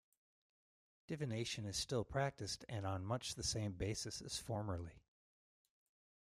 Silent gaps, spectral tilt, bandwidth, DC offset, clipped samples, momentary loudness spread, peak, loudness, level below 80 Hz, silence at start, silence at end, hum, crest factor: none; -4 dB/octave; 15.5 kHz; under 0.1%; under 0.1%; 6 LU; -26 dBFS; -43 LUFS; -64 dBFS; 1.1 s; 1.25 s; none; 20 dB